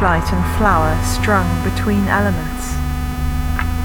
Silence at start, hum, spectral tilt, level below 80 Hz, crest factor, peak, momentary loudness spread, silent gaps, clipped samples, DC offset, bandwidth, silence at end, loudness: 0 s; none; -6 dB/octave; -22 dBFS; 14 dB; -2 dBFS; 7 LU; none; under 0.1%; under 0.1%; 19 kHz; 0 s; -18 LUFS